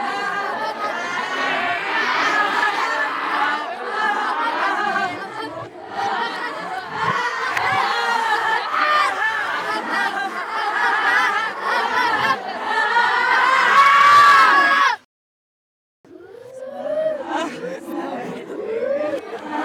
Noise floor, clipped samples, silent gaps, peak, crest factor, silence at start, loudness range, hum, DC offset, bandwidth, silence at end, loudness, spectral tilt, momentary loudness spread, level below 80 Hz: -40 dBFS; under 0.1%; 15.05-16.04 s; -4 dBFS; 16 dB; 0 s; 12 LU; none; under 0.1%; 19 kHz; 0 s; -18 LUFS; -2.5 dB/octave; 16 LU; -70 dBFS